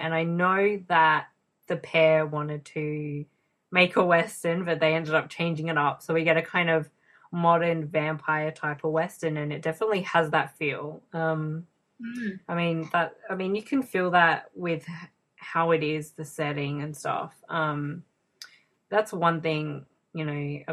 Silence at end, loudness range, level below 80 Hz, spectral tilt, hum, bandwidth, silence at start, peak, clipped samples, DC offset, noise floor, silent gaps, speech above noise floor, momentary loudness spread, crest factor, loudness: 0 s; 5 LU; -72 dBFS; -6 dB/octave; none; 13.5 kHz; 0 s; -4 dBFS; under 0.1%; under 0.1%; -51 dBFS; none; 25 dB; 13 LU; 22 dB; -26 LUFS